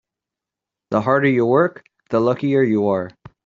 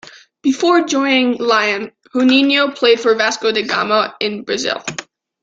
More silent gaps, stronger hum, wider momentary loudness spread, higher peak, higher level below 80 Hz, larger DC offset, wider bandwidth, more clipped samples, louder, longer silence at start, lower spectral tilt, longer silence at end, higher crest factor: neither; neither; about the same, 8 LU vs 10 LU; about the same, -2 dBFS vs -2 dBFS; about the same, -60 dBFS vs -64 dBFS; neither; about the same, 7.2 kHz vs 7.8 kHz; neither; second, -18 LUFS vs -15 LUFS; first, 0.9 s vs 0.05 s; first, -6.5 dB/octave vs -3 dB/octave; about the same, 0.35 s vs 0.4 s; about the same, 18 dB vs 14 dB